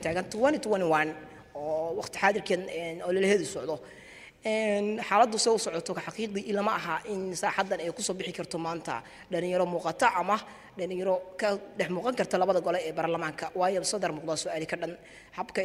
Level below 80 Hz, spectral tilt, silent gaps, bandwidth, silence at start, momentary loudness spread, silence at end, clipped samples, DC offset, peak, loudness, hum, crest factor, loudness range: -66 dBFS; -4 dB/octave; none; 15.5 kHz; 0 s; 11 LU; 0 s; under 0.1%; under 0.1%; -8 dBFS; -30 LUFS; none; 22 dB; 3 LU